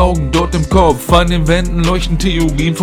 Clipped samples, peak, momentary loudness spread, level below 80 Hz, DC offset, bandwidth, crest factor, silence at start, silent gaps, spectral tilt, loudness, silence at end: under 0.1%; 0 dBFS; 4 LU; -18 dBFS; under 0.1%; 16 kHz; 12 dB; 0 s; none; -5.5 dB/octave; -13 LUFS; 0 s